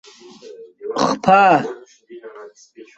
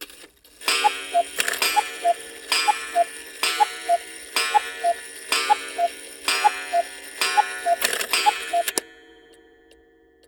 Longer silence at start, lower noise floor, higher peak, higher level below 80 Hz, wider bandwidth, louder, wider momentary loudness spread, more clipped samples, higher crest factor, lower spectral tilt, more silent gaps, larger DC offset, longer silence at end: first, 0.45 s vs 0 s; second, -41 dBFS vs -56 dBFS; about the same, 0 dBFS vs -2 dBFS; first, -60 dBFS vs -66 dBFS; second, 8.2 kHz vs over 20 kHz; first, -15 LUFS vs -23 LUFS; first, 26 LU vs 6 LU; neither; about the same, 18 dB vs 22 dB; first, -5 dB/octave vs 1.5 dB/octave; neither; neither; second, 0.15 s vs 1.35 s